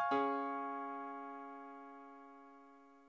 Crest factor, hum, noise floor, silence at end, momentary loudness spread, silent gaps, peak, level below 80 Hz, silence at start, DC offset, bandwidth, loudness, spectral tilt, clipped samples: 16 dB; none; -62 dBFS; 0 s; 23 LU; none; -26 dBFS; -86 dBFS; 0 s; under 0.1%; 8 kHz; -42 LUFS; -5.5 dB/octave; under 0.1%